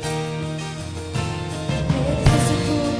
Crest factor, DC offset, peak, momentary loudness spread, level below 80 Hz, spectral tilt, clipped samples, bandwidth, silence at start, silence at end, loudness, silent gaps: 20 dB; under 0.1%; -2 dBFS; 11 LU; -32 dBFS; -5.5 dB/octave; under 0.1%; 11 kHz; 0 s; 0 s; -22 LUFS; none